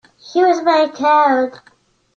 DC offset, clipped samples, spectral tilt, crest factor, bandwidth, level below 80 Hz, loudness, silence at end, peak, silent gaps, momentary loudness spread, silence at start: under 0.1%; under 0.1%; -3.5 dB/octave; 14 dB; 7.2 kHz; -68 dBFS; -15 LUFS; 0.6 s; -2 dBFS; none; 8 LU; 0.25 s